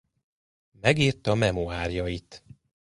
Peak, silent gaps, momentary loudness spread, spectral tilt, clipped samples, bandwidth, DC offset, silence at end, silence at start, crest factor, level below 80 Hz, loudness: -4 dBFS; none; 10 LU; -5.5 dB/octave; under 0.1%; 11.5 kHz; under 0.1%; 0.6 s; 0.85 s; 24 dB; -44 dBFS; -26 LUFS